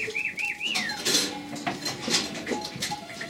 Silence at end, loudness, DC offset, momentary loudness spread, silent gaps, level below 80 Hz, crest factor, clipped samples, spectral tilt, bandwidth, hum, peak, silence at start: 0 s; -27 LUFS; under 0.1%; 8 LU; none; -64 dBFS; 20 dB; under 0.1%; -1.5 dB/octave; 16.5 kHz; none; -10 dBFS; 0 s